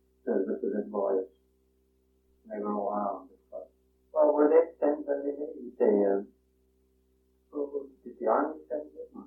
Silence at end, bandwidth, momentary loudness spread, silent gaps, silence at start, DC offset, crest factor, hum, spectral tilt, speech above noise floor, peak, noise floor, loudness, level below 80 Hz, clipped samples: 0 s; 2.9 kHz; 21 LU; none; 0.25 s; under 0.1%; 20 dB; none; -11.5 dB/octave; 41 dB; -10 dBFS; -69 dBFS; -29 LUFS; -72 dBFS; under 0.1%